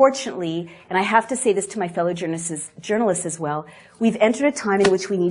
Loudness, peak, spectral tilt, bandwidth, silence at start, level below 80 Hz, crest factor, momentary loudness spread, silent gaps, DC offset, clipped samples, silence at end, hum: -22 LUFS; -2 dBFS; -4.5 dB/octave; 11 kHz; 0 s; -62 dBFS; 18 dB; 9 LU; none; under 0.1%; under 0.1%; 0 s; none